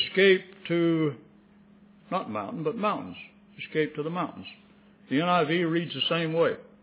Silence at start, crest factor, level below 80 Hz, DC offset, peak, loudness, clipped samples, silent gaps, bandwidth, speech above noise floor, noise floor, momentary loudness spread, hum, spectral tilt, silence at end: 0 s; 18 dB; -72 dBFS; under 0.1%; -10 dBFS; -27 LUFS; under 0.1%; none; 4 kHz; 29 dB; -56 dBFS; 18 LU; none; -9.5 dB/octave; 0.2 s